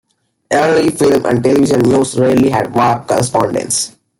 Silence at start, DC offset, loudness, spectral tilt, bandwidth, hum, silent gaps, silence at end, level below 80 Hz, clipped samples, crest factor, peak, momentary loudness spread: 0.5 s; under 0.1%; -13 LUFS; -5 dB/octave; 17 kHz; none; none; 0.3 s; -48 dBFS; under 0.1%; 12 dB; 0 dBFS; 4 LU